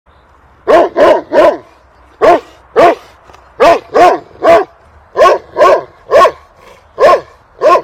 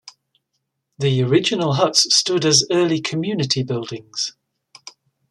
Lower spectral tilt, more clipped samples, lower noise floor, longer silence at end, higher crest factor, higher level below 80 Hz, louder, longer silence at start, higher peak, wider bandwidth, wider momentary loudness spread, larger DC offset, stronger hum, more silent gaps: about the same, -4.5 dB/octave vs -3.5 dB/octave; first, 5% vs under 0.1%; second, -44 dBFS vs -75 dBFS; second, 0 s vs 0.4 s; second, 10 dB vs 20 dB; first, -42 dBFS vs -62 dBFS; first, -9 LUFS vs -18 LUFS; first, 0.65 s vs 0.05 s; about the same, 0 dBFS vs 0 dBFS; first, 14.5 kHz vs 12.5 kHz; second, 6 LU vs 11 LU; neither; neither; neither